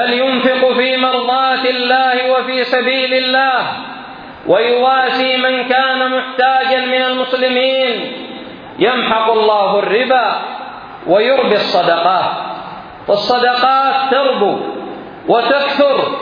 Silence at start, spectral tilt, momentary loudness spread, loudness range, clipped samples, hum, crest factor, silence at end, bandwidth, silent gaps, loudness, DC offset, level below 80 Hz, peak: 0 s; -5.5 dB/octave; 15 LU; 2 LU; under 0.1%; none; 14 dB; 0 s; 5.2 kHz; none; -13 LUFS; under 0.1%; -58 dBFS; 0 dBFS